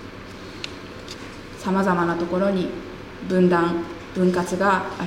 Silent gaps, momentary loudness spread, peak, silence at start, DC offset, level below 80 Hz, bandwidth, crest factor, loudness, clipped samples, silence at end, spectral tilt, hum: none; 18 LU; -6 dBFS; 0 s; under 0.1%; -48 dBFS; 13 kHz; 16 dB; -22 LUFS; under 0.1%; 0 s; -6.5 dB/octave; none